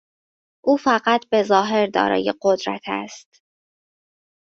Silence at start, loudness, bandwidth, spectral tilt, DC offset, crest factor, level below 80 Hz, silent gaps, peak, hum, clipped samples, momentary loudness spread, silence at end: 0.65 s; -20 LUFS; 7.8 kHz; -4.5 dB/octave; under 0.1%; 20 dB; -64 dBFS; none; -2 dBFS; none; under 0.1%; 10 LU; 1.35 s